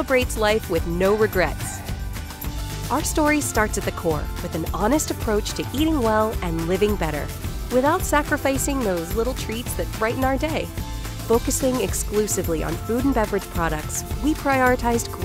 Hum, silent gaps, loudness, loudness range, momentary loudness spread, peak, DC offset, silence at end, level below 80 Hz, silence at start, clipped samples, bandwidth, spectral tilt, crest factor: none; none; -23 LUFS; 2 LU; 10 LU; -6 dBFS; under 0.1%; 0 s; -32 dBFS; 0 s; under 0.1%; 16 kHz; -4.5 dB/octave; 18 dB